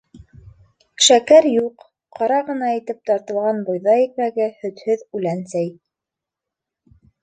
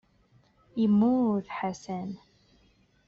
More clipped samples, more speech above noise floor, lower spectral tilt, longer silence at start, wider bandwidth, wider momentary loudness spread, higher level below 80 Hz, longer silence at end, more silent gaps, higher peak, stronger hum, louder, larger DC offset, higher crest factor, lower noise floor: neither; first, 68 dB vs 38 dB; second, -3 dB/octave vs -7.5 dB/octave; second, 0.15 s vs 0.75 s; first, 9.4 kHz vs 7.2 kHz; second, 12 LU vs 16 LU; first, -60 dBFS vs -66 dBFS; first, 1.5 s vs 0.9 s; neither; first, 0 dBFS vs -16 dBFS; neither; first, -18 LUFS vs -28 LUFS; neither; about the same, 18 dB vs 14 dB; first, -86 dBFS vs -64 dBFS